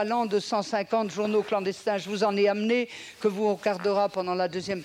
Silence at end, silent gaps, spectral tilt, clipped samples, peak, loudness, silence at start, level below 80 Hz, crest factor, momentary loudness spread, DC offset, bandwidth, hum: 0 s; none; -5 dB/octave; under 0.1%; -12 dBFS; -27 LUFS; 0 s; -72 dBFS; 14 dB; 5 LU; under 0.1%; 13.5 kHz; none